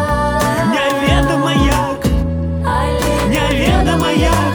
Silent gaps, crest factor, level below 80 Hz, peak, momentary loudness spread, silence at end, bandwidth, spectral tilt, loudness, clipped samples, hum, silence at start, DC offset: none; 14 dB; -22 dBFS; 0 dBFS; 4 LU; 0 s; over 20 kHz; -5.5 dB/octave; -15 LUFS; under 0.1%; none; 0 s; under 0.1%